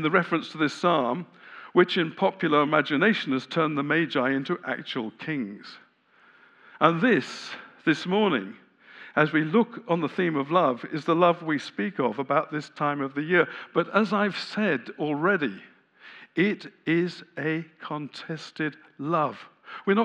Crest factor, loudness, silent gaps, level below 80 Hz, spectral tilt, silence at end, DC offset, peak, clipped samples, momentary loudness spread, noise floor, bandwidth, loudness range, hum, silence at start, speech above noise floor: 22 dB; -26 LUFS; none; -88 dBFS; -6.5 dB/octave; 0 s; under 0.1%; -4 dBFS; under 0.1%; 13 LU; -60 dBFS; 9.6 kHz; 5 LU; none; 0 s; 34 dB